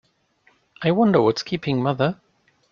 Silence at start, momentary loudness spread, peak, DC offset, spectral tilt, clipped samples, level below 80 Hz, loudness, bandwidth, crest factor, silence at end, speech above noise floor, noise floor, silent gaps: 0.8 s; 9 LU; -4 dBFS; under 0.1%; -7 dB/octave; under 0.1%; -60 dBFS; -21 LUFS; 7.2 kHz; 18 dB; 0.6 s; 42 dB; -62 dBFS; none